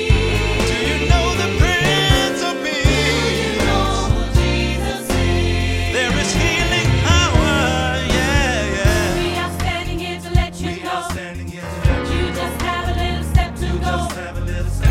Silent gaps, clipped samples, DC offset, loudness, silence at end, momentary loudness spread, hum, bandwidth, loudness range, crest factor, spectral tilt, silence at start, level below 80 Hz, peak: none; under 0.1%; under 0.1%; -18 LUFS; 0 s; 9 LU; none; 16 kHz; 5 LU; 16 dB; -4.5 dB/octave; 0 s; -22 dBFS; 0 dBFS